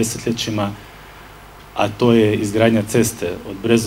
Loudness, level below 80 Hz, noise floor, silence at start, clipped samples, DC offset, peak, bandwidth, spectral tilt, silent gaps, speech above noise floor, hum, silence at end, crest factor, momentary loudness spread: -18 LUFS; -46 dBFS; -40 dBFS; 0 s; under 0.1%; under 0.1%; 0 dBFS; 16 kHz; -5 dB/octave; none; 23 dB; none; 0 s; 18 dB; 15 LU